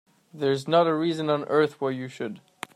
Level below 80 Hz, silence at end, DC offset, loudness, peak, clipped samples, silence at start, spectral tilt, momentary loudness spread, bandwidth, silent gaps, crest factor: -74 dBFS; 0.35 s; under 0.1%; -25 LUFS; -8 dBFS; under 0.1%; 0.35 s; -6.5 dB/octave; 14 LU; 14 kHz; none; 18 dB